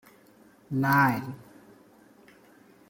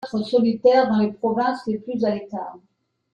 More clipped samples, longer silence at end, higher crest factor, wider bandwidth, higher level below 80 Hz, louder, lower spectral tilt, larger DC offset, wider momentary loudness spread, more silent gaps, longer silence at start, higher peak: neither; first, 1.5 s vs 0.55 s; first, 22 dB vs 16 dB; first, 16.5 kHz vs 8.8 kHz; about the same, -68 dBFS vs -64 dBFS; second, -25 LUFS vs -21 LUFS; about the same, -7 dB/octave vs -7.5 dB/octave; neither; first, 20 LU vs 14 LU; neither; first, 0.7 s vs 0 s; about the same, -8 dBFS vs -6 dBFS